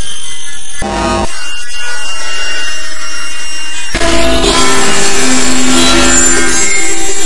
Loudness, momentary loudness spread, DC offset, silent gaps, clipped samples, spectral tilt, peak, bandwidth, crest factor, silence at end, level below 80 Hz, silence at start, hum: -11 LUFS; 13 LU; 50%; none; 2%; -2 dB/octave; 0 dBFS; 12 kHz; 14 dB; 0 s; -24 dBFS; 0 s; none